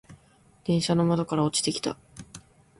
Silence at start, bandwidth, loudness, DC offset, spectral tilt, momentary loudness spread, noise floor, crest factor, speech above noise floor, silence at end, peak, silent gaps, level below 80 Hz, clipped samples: 0.1 s; 11.5 kHz; -26 LUFS; under 0.1%; -5 dB/octave; 21 LU; -59 dBFS; 18 dB; 34 dB; 0.4 s; -10 dBFS; none; -58 dBFS; under 0.1%